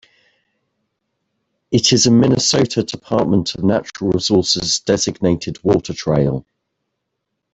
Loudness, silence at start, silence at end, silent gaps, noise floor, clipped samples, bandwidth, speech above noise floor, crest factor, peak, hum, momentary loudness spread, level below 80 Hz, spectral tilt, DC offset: -16 LUFS; 1.7 s; 1.15 s; none; -76 dBFS; under 0.1%; 8.4 kHz; 60 dB; 16 dB; -2 dBFS; none; 8 LU; -46 dBFS; -4.5 dB/octave; under 0.1%